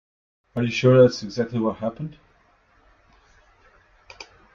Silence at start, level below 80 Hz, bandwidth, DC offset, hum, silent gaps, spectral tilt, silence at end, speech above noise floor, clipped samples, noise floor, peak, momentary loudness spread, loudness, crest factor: 0.55 s; -58 dBFS; 7.2 kHz; under 0.1%; none; none; -7 dB/octave; 0.3 s; 40 dB; under 0.1%; -60 dBFS; -4 dBFS; 27 LU; -21 LUFS; 20 dB